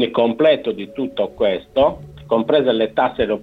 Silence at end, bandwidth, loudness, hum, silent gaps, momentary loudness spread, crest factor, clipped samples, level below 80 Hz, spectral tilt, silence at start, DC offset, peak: 0 s; 5 kHz; -18 LUFS; none; none; 10 LU; 14 dB; under 0.1%; -48 dBFS; -7.5 dB/octave; 0 s; under 0.1%; -4 dBFS